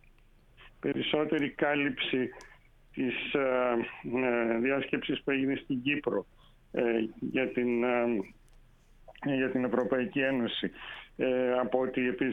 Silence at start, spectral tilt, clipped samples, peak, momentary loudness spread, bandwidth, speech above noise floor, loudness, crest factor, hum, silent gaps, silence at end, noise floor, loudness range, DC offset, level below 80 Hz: 0.6 s; -7 dB/octave; under 0.1%; -12 dBFS; 7 LU; 6.6 kHz; 30 dB; -31 LUFS; 18 dB; none; none; 0 s; -60 dBFS; 2 LU; under 0.1%; -60 dBFS